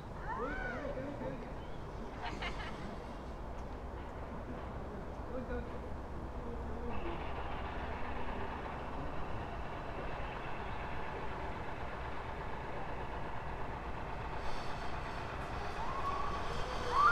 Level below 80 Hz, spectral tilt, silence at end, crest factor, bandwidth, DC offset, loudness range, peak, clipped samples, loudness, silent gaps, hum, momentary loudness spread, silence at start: -46 dBFS; -6 dB/octave; 0 s; 22 dB; 12 kHz; under 0.1%; 3 LU; -18 dBFS; under 0.1%; -42 LUFS; none; none; 6 LU; 0 s